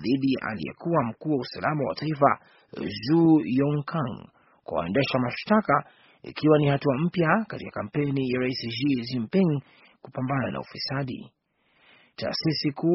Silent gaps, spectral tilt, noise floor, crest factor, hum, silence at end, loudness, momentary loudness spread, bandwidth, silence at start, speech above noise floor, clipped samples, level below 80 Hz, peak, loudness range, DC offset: none; -5.5 dB/octave; -65 dBFS; 22 dB; none; 0 s; -26 LUFS; 13 LU; 6 kHz; 0 s; 40 dB; under 0.1%; -60 dBFS; -4 dBFS; 5 LU; under 0.1%